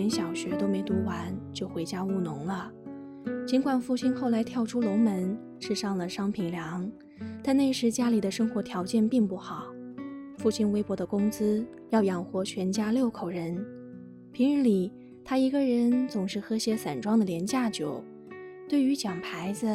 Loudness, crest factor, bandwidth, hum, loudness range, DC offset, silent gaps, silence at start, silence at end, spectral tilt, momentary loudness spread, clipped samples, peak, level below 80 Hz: -29 LUFS; 16 dB; 14 kHz; none; 3 LU; under 0.1%; none; 0 s; 0 s; -6 dB/octave; 15 LU; under 0.1%; -14 dBFS; -66 dBFS